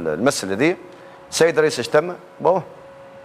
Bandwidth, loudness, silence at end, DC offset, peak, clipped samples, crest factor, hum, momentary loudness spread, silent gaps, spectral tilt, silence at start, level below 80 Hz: 16 kHz; -19 LUFS; 0 s; under 0.1%; -4 dBFS; under 0.1%; 16 dB; none; 13 LU; none; -4 dB/octave; 0 s; -62 dBFS